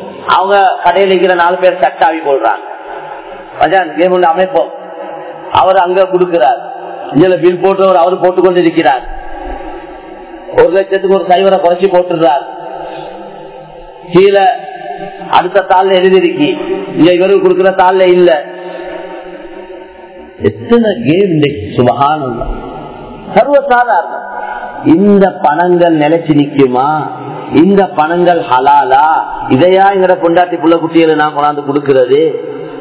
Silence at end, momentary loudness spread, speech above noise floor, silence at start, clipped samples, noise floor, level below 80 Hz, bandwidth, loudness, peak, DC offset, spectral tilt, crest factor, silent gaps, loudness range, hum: 0 s; 17 LU; 23 dB; 0 s; 2%; -31 dBFS; -38 dBFS; 4 kHz; -9 LUFS; 0 dBFS; under 0.1%; -10 dB/octave; 10 dB; none; 4 LU; none